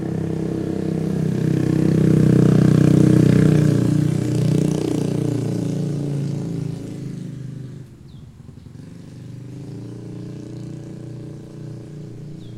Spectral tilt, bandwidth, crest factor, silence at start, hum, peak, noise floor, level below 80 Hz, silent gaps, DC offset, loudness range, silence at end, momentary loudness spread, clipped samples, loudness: -8.5 dB/octave; 12.5 kHz; 18 dB; 0 s; none; -2 dBFS; -40 dBFS; -46 dBFS; none; under 0.1%; 20 LU; 0 s; 22 LU; under 0.1%; -18 LUFS